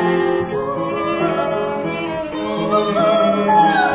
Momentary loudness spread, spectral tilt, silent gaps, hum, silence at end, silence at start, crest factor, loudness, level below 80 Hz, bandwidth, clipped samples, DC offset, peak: 9 LU; -10 dB/octave; none; none; 0 s; 0 s; 14 dB; -18 LUFS; -50 dBFS; 4 kHz; under 0.1%; under 0.1%; -4 dBFS